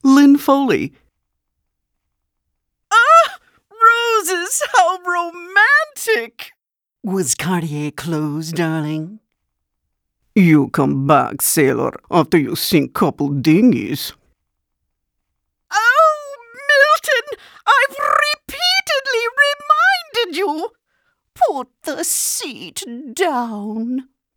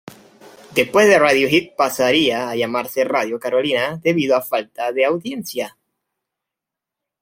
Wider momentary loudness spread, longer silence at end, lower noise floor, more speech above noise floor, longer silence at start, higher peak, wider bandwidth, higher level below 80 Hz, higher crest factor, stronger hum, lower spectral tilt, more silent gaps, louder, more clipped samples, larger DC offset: first, 15 LU vs 11 LU; second, 0.35 s vs 1.5 s; second, -74 dBFS vs -85 dBFS; second, 57 dB vs 67 dB; about the same, 0.05 s vs 0.1 s; about the same, 0 dBFS vs 0 dBFS; first, over 20 kHz vs 16.5 kHz; about the same, -58 dBFS vs -60 dBFS; about the same, 18 dB vs 18 dB; neither; about the same, -4 dB/octave vs -4 dB/octave; neither; first, -15 LUFS vs -18 LUFS; neither; neither